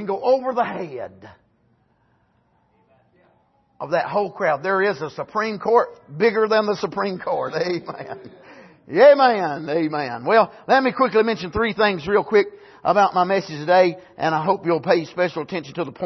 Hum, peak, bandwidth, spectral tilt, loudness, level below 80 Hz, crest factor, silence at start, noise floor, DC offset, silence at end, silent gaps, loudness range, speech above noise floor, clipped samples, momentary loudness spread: none; -2 dBFS; 6.2 kHz; -6 dB/octave; -20 LUFS; -56 dBFS; 18 dB; 0 s; -63 dBFS; under 0.1%; 0 s; none; 9 LU; 43 dB; under 0.1%; 12 LU